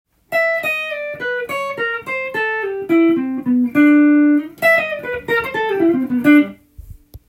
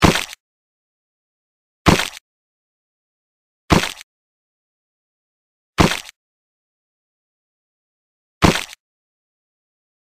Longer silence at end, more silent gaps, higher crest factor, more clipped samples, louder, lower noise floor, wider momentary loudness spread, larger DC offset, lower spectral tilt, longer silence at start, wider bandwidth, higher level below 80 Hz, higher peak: second, 0.1 s vs 1.4 s; second, none vs 0.40-1.85 s, 2.21-3.68 s, 4.03-5.73 s, 6.16-8.41 s; second, 16 dB vs 22 dB; neither; about the same, -16 LUFS vs -18 LUFS; second, -39 dBFS vs under -90 dBFS; second, 10 LU vs 14 LU; neither; first, -6 dB/octave vs -4.5 dB/octave; first, 0.3 s vs 0 s; about the same, 16 kHz vs 15.5 kHz; second, -50 dBFS vs -36 dBFS; about the same, 0 dBFS vs -2 dBFS